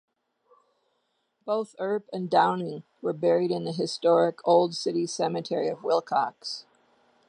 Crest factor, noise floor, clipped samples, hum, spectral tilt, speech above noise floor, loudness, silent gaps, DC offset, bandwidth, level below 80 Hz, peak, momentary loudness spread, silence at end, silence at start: 20 dB; -75 dBFS; under 0.1%; none; -5 dB/octave; 49 dB; -26 LUFS; none; under 0.1%; 10.5 kHz; -82 dBFS; -8 dBFS; 11 LU; 0.7 s; 1.45 s